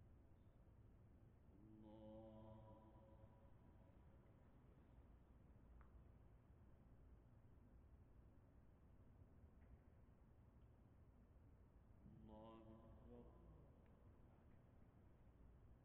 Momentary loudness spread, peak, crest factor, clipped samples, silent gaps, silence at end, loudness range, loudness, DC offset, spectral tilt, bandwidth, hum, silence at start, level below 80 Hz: 7 LU; -50 dBFS; 16 dB; under 0.1%; none; 0 s; 2 LU; -66 LUFS; under 0.1%; -8 dB/octave; 3.7 kHz; none; 0 s; -72 dBFS